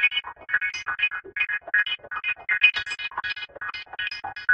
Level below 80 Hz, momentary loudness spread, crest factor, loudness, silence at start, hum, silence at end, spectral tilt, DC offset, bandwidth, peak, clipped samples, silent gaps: -64 dBFS; 12 LU; 22 dB; -25 LUFS; 0 s; none; 0 s; 0 dB/octave; under 0.1%; 8.8 kHz; -4 dBFS; under 0.1%; none